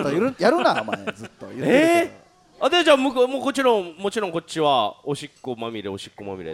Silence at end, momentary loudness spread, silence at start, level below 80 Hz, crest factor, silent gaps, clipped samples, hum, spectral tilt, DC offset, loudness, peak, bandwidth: 0 s; 16 LU; 0 s; -62 dBFS; 20 dB; none; under 0.1%; none; -4.5 dB/octave; under 0.1%; -21 LUFS; -2 dBFS; 15.5 kHz